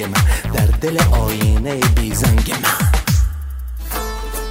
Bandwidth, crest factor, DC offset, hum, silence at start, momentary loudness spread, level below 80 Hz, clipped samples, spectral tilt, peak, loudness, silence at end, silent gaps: 16.5 kHz; 14 dB; under 0.1%; none; 0 s; 10 LU; -18 dBFS; under 0.1%; -5 dB/octave; -2 dBFS; -17 LUFS; 0 s; none